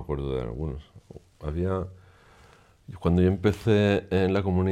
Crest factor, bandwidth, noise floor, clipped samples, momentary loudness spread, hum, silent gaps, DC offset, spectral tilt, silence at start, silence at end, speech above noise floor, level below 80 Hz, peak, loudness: 18 dB; 12 kHz; -56 dBFS; under 0.1%; 15 LU; none; none; under 0.1%; -8 dB/octave; 0 s; 0 s; 30 dB; -44 dBFS; -10 dBFS; -26 LUFS